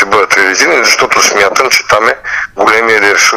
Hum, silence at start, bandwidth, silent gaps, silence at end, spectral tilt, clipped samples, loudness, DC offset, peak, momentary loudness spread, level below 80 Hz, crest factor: none; 0 s; 16.5 kHz; none; 0 s; -0.5 dB/octave; 0.6%; -7 LUFS; 0.3%; 0 dBFS; 5 LU; -46 dBFS; 8 dB